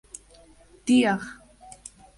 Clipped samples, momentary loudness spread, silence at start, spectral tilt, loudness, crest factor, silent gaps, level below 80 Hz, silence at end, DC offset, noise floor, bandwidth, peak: under 0.1%; 24 LU; 0.85 s; -4.5 dB/octave; -23 LUFS; 18 dB; none; -60 dBFS; 0.85 s; under 0.1%; -54 dBFS; 11.5 kHz; -10 dBFS